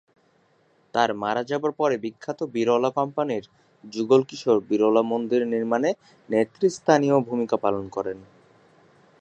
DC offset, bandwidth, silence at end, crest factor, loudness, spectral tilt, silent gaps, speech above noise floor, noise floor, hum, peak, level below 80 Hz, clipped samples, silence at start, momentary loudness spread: under 0.1%; 9 kHz; 0.95 s; 22 dB; -24 LUFS; -6 dB/octave; none; 40 dB; -63 dBFS; none; -2 dBFS; -68 dBFS; under 0.1%; 0.95 s; 11 LU